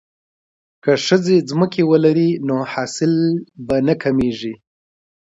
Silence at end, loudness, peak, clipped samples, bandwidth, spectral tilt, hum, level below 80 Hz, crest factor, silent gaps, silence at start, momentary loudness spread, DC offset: 0.85 s; -17 LUFS; 0 dBFS; under 0.1%; 8 kHz; -6 dB/octave; none; -52 dBFS; 18 dB; none; 0.85 s; 9 LU; under 0.1%